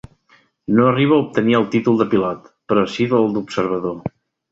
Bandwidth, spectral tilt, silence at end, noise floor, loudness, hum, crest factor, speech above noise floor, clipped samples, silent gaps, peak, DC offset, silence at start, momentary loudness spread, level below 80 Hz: 7.8 kHz; -7.5 dB/octave; 0.45 s; -56 dBFS; -18 LUFS; none; 16 dB; 39 dB; under 0.1%; none; -2 dBFS; under 0.1%; 0.7 s; 12 LU; -54 dBFS